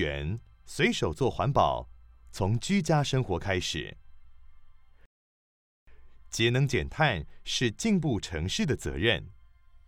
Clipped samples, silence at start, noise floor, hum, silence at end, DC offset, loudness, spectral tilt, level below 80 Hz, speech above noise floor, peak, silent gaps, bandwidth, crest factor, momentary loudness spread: under 0.1%; 0 s; -54 dBFS; none; 0.45 s; under 0.1%; -28 LUFS; -5 dB/octave; -48 dBFS; 26 dB; -8 dBFS; 5.06-5.87 s; 16 kHz; 22 dB; 10 LU